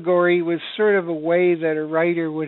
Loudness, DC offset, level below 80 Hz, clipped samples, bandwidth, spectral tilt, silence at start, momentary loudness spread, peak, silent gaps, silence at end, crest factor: -20 LUFS; under 0.1%; -72 dBFS; under 0.1%; 4.2 kHz; -5 dB/octave; 0 s; 4 LU; -6 dBFS; none; 0 s; 12 dB